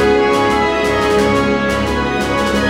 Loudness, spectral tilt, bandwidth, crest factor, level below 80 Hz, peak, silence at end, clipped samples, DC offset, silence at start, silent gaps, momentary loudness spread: -14 LUFS; -5 dB/octave; 16.5 kHz; 12 dB; -30 dBFS; -2 dBFS; 0 s; under 0.1%; under 0.1%; 0 s; none; 4 LU